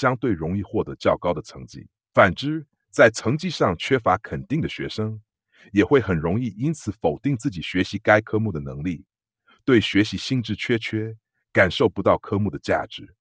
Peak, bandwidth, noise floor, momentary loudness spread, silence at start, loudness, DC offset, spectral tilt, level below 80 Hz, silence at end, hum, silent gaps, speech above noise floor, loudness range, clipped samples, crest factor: 0 dBFS; 9.6 kHz; -62 dBFS; 12 LU; 0 s; -22 LUFS; under 0.1%; -6 dB/octave; -50 dBFS; 0.15 s; none; none; 40 dB; 3 LU; under 0.1%; 22 dB